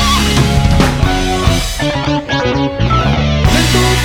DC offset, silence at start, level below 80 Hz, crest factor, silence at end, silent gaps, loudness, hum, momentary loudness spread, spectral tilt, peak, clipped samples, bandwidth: under 0.1%; 0 s; -18 dBFS; 12 dB; 0 s; none; -12 LUFS; none; 4 LU; -5 dB/octave; 0 dBFS; under 0.1%; 19 kHz